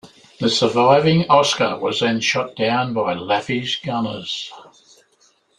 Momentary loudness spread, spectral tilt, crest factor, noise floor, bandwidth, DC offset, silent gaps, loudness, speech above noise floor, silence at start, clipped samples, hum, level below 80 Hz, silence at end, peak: 10 LU; -4.5 dB/octave; 18 dB; -59 dBFS; 11 kHz; under 0.1%; none; -18 LUFS; 41 dB; 0.05 s; under 0.1%; none; -58 dBFS; 0.95 s; -2 dBFS